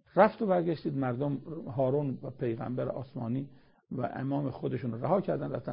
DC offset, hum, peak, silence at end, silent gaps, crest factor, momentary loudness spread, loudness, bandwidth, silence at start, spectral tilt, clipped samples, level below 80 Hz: under 0.1%; none; -8 dBFS; 0 s; none; 22 dB; 10 LU; -32 LUFS; 5.2 kHz; 0.15 s; -7.5 dB/octave; under 0.1%; -64 dBFS